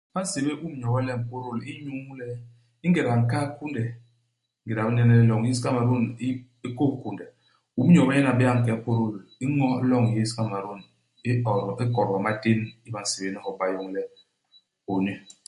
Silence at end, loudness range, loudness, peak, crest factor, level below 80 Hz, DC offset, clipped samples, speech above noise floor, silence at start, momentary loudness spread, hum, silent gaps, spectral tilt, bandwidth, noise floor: 0.3 s; 6 LU; -25 LUFS; -8 dBFS; 18 dB; -60 dBFS; under 0.1%; under 0.1%; 49 dB; 0.15 s; 16 LU; none; none; -6.5 dB/octave; 11.5 kHz; -73 dBFS